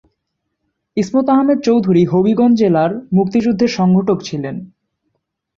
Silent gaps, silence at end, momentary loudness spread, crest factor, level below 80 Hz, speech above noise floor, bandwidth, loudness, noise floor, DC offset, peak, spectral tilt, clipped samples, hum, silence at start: none; 0.9 s; 11 LU; 12 dB; -54 dBFS; 60 dB; 7.4 kHz; -14 LUFS; -73 dBFS; under 0.1%; -2 dBFS; -7.5 dB/octave; under 0.1%; none; 0.95 s